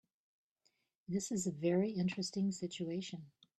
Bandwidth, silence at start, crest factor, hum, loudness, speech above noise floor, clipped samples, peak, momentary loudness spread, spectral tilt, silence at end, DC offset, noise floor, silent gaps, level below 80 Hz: 12.5 kHz; 1.1 s; 16 dB; none; -38 LUFS; 43 dB; under 0.1%; -24 dBFS; 12 LU; -5.5 dB/octave; 0.3 s; under 0.1%; -80 dBFS; none; -76 dBFS